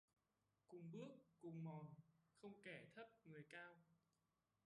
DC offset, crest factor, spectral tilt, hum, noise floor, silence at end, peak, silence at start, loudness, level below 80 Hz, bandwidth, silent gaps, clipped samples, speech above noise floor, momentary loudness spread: under 0.1%; 18 dB; -7 dB/octave; none; under -90 dBFS; 0.7 s; -44 dBFS; 0.7 s; -60 LUFS; under -90 dBFS; 11 kHz; none; under 0.1%; over 31 dB; 9 LU